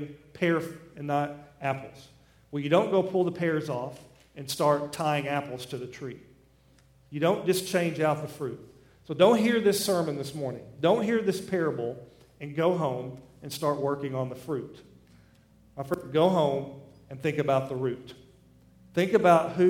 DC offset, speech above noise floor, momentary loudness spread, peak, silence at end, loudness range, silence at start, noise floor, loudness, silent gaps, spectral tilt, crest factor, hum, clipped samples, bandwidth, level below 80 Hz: under 0.1%; 33 dB; 18 LU; -6 dBFS; 0 s; 6 LU; 0 s; -60 dBFS; -28 LUFS; none; -5.5 dB/octave; 22 dB; none; under 0.1%; 18 kHz; -64 dBFS